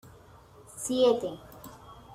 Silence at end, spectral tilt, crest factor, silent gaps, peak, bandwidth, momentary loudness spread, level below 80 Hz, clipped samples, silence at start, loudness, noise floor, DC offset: 0 s; -4 dB/octave; 20 dB; none; -12 dBFS; 16 kHz; 23 LU; -62 dBFS; under 0.1%; 0.05 s; -28 LUFS; -54 dBFS; under 0.1%